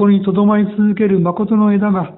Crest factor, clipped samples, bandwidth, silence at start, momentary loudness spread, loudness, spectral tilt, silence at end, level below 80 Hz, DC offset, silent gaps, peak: 12 dB; under 0.1%; 4 kHz; 0 s; 2 LU; -14 LUFS; -13.5 dB/octave; 0.05 s; -52 dBFS; under 0.1%; none; -2 dBFS